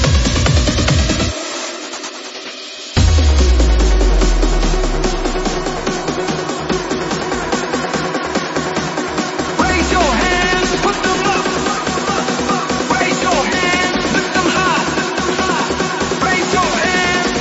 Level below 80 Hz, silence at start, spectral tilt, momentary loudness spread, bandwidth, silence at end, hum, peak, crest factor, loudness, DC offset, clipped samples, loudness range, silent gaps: -20 dBFS; 0 s; -4 dB/octave; 6 LU; 8 kHz; 0 s; none; -2 dBFS; 14 dB; -16 LUFS; under 0.1%; under 0.1%; 4 LU; none